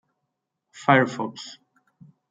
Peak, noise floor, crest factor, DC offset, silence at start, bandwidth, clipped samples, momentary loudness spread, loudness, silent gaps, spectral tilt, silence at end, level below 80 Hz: -2 dBFS; -80 dBFS; 24 dB; under 0.1%; 0.75 s; 9.2 kHz; under 0.1%; 20 LU; -22 LUFS; none; -6 dB/octave; 0.8 s; -74 dBFS